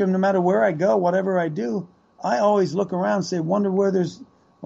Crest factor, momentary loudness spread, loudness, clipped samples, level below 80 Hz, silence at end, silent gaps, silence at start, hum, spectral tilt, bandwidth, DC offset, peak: 14 dB; 8 LU; -21 LUFS; under 0.1%; -68 dBFS; 0 s; none; 0 s; none; -7 dB/octave; 7.8 kHz; under 0.1%; -8 dBFS